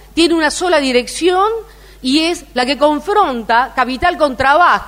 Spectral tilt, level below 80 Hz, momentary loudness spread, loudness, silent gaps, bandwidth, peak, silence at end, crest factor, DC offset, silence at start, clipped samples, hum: -3 dB/octave; -38 dBFS; 5 LU; -14 LUFS; none; 16 kHz; 0 dBFS; 0 s; 14 dB; under 0.1%; 0.15 s; under 0.1%; none